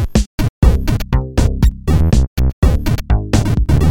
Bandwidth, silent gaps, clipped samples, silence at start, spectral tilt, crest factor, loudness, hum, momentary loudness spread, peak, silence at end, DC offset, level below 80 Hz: 16.5 kHz; 0.26-0.38 s, 0.49-0.62 s, 2.27-2.36 s, 2.53-2.62 s; under 0.1%; 0 s; -7 dB/octave; 12 dB; -16 LUFS; none; 4 LU; 0 dBFS; 0 s; under 0.1%; -16 dBFS